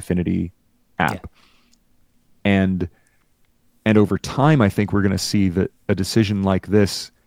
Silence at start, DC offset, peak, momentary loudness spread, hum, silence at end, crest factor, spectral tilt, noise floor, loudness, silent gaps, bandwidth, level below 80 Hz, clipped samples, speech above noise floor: 0 s; under 0.1%; 0 dBFS; 8 LU; none; 0.2 s; 20 dB; -6 dB/octave; -60 dBFS; -20 LUFS; none; 16.5 kHz; -46 dBFS; under 0.1%; 41 dB